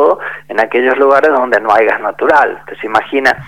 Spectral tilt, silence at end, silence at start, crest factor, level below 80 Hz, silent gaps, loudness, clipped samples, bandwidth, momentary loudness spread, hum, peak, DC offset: -5 dB/octave; 0 s; 0 s; 12 dB; -52 dBFS; none; -11 LUFS; 0.2%; 15.5 kHz; 7 LU; none; 0 dBFS; 0.8%